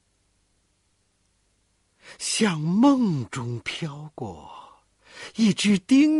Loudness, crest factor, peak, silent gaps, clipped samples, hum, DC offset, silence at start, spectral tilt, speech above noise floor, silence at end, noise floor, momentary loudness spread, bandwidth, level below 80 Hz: -23 LUFS; 16 dB; -8 dBFS; none; under 0.1%; 50 Hz at -50 dBFS; under 0.1%; 2.1 s; -5 dB/octave; 47 dB; 0 s; -69 dBFS; 18 LU; 11.5 kHz; -62 dBFS